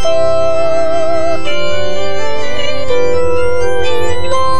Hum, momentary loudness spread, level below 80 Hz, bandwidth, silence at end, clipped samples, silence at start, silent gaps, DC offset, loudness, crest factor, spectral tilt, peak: none; 5 LU; -36 dBFS; 11 kHz; 0 s; under 0.1%; 0 s; none; 40%; -15 LUFS; 10 dB; -4.5 dB/octave; 0 dBFS